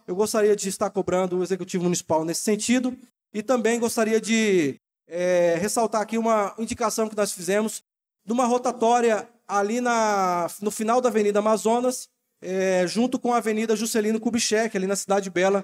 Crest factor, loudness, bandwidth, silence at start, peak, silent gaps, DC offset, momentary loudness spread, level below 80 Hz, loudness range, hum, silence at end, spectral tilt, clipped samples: 14 dB; -23 LUFS; 16.5 kHz; 0.1 s; -10 dBFS; none; under 0.1%; 7 LU; -68 dBFS; 2 LU; none; 0 s; -4 dB/octave; under 0.1%